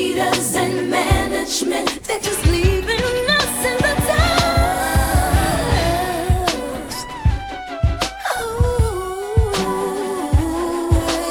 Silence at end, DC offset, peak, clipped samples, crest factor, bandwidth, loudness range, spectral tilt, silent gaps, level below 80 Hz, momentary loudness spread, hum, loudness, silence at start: 0 s; under 0.1%; -2 dBFS; under 0.1%; 16 dB; over 20 kHz; 4 LU; -4.5 dB/octave; none; -26 dBFS; 6 LU; none; -19 LUFS; 0 s